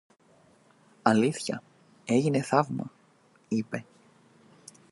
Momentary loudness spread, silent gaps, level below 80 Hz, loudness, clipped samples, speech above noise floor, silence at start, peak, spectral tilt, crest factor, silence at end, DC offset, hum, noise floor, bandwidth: 14 LU; none; -74 dBFS; -28 LUFS; under 0.1%; 36 dB; 1.05 s; -4 dBFS; -6 dB/octave; 26 dB; 1.1 s; under 0.1%; none; -62 dBFS; 11.5 kHz